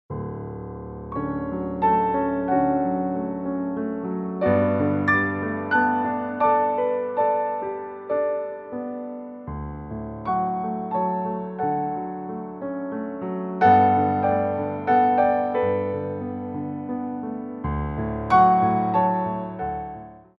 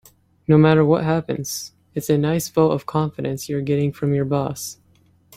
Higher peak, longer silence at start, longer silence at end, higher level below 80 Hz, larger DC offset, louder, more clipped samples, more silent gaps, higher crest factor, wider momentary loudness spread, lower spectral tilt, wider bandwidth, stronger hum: second, -6 dBFS vs -2 dBFS; second, 0.1 s vs 0.5 s; second, 0.2 s vs 0.65 s; first, -46 dBFS vs -52 dBFS; neither; second, -24 LUFS vs -20 LUFS; neither; neither; about the same, 18 dB vs 18 dB; about the same, 14 LU vs 14 LU; first, -9.5 dB/octave vs -6.5 dB/octave; second, 5.8 kHz vs 16 kHz; neither